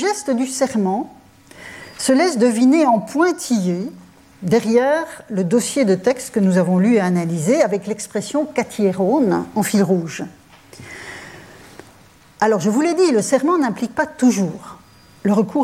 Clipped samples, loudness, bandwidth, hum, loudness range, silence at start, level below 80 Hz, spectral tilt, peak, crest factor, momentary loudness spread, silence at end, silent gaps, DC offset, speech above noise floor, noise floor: under 0.1%; -18 LUFS; 15.5 kHz; none; 4 LU; 0 s; -60 dBFS; -5.5 dB/octave; -4 dBFS; 14 dB; 17 LU; 0 s; none; under 0.1%; 31 dB; -48 dBFS